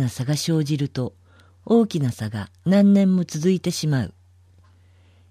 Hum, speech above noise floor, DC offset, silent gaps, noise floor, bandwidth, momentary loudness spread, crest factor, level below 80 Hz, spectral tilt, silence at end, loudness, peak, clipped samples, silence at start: none; 33 dB; under 0.1%; none; -53 dBFS; 15 kHz; 14 LU; 16 dB; -58 dBFS; -6.5 dB/octave; 1.2 s; -21 LUFS; -6 dBFS; under 0.1%; 0 s